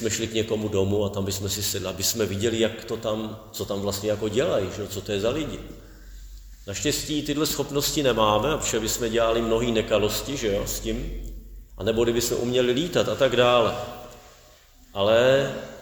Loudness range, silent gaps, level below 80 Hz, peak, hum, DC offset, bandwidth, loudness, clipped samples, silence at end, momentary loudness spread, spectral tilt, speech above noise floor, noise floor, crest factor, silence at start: 5 LU; none; -42 dBFS; -6 dBFS; none; under 0.1%; over 20 kHz; -24 LUFS; under 0.1%; 0 s; 13 LU; -4 dB/octave; 28 dB; -52 dBFS; 20 dB; 0 s